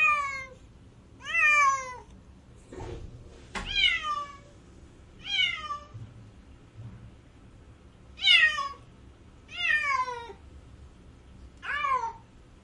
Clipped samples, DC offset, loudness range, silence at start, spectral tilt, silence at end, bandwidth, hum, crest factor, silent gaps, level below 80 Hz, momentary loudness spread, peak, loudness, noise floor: under 0.1%; under 0.1%; 8 LU; 0 s; -1 dB/octave; 0.4 s; 11.5 kHz; none; 24 dB; none; -52 dBFS; 27 LU; -6 dBFS; -25 LUFS; -52 dBFS